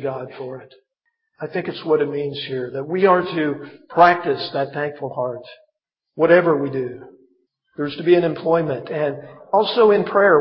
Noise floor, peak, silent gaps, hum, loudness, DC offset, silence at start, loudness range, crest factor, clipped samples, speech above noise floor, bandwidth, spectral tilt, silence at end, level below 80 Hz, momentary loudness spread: -76 dBFS; 0 dBFS; none; none; -19 LUFS; under 0.1%; 0 s; 3 LU; 20 dB; under 0.1%; 57 dB; 6 kHz; -8.5 dB/octave; 0 s; -68 dBFS; 18 LU